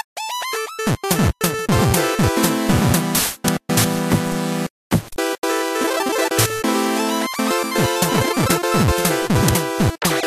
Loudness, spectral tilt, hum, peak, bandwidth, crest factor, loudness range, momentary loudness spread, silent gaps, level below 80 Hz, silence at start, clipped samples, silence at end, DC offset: -19 LUFS; -4.5 dB/octave; none; -2 dBFS; 15 kHz; 16 dB; 2 LU; 6 LU; 4.70-4.90 s, 5.38-5.42 s; -36 dBFS; 0.15 s; under 0.1%; 0 s; under 0.1%